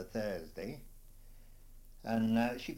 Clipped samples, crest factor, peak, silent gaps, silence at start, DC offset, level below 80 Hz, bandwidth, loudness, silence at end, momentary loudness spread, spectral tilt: under 0.1%; 18 dB; -20 dBFS; none; 0 s; under 0.1%; -54 dBFS; 16.5 kHz; -37 LUFS; 0 s; 15 LU; -6.5 dB/octave